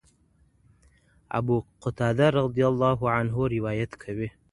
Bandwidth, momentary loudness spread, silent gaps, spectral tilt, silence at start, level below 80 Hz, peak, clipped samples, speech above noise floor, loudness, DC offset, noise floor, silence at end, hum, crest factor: 11 kHz; 11 LU; none; -8 dB/octave; 1.3 s; -52 dBFS; -8 dBFS; under 0.1%; 38 dB; -26 LUFS; under 0.1%; -63 dBFS; 0.25 s; none; 20 dB